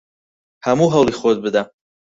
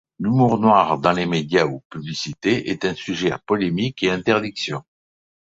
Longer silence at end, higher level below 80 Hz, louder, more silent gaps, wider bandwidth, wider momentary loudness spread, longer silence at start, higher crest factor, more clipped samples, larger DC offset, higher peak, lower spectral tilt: second, 0.5 s vs 0.8 s; about the same, -52 dBFS vs -54 dBFS; first, -17 LUFS vs -20 LUFS; second, none vs 1.85-1.90 s; about the same, 8 kHz vs 7.8 kHz; about the same, 10 LU vs 12 LU; first, 0.65 s vs 0.2 s; about the same, 16 dB vs 20 dB; neither; neither; about the same, -2 dBFS vs -2 dBFS; about the same, -6 dB/octave vs -6 dB/octave